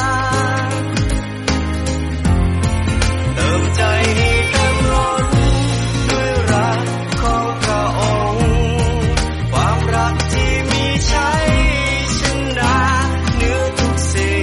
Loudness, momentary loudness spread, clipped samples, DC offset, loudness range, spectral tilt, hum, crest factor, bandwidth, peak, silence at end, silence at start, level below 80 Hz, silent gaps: -16 LUFS; 4 LU; under 0.1%; under 0.1%; 2 LU; -5 dB/octave; none; 12 dB; 11.5 kHz; -2 dBFS; 0 s; 0 s; -22 dBFS; none